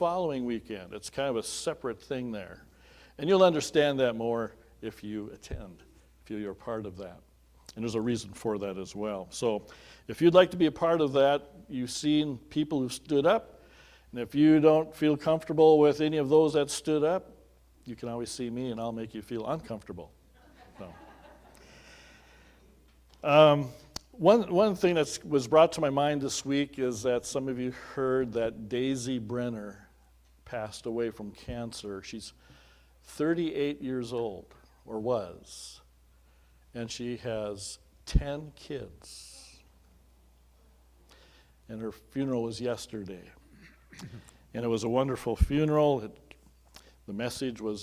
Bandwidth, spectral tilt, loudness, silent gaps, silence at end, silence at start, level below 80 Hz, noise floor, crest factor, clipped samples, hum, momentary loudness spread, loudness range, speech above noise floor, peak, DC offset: 16 kHz; -5.5 dB/octave; -29 LUFS; none; 0 s; 0 s; -48 dBFS; -61 dBFS; 22 dB; under 0.1%; none; 21 LU; 14 LU; 32 dB; -6 dBFS; under 0.1%